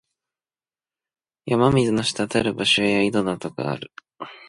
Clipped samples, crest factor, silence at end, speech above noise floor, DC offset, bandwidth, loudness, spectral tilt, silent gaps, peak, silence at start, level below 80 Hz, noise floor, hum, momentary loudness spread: under 0.1%; 18 dB; 0.1 s; over 68 dB; under 0.1%; 11.5 kHz; -21 LUFS; -5 dB/octave; none; -4 dBFS; 1.45 s; -52 dBFS; under -90 dBFS; none; 21 LU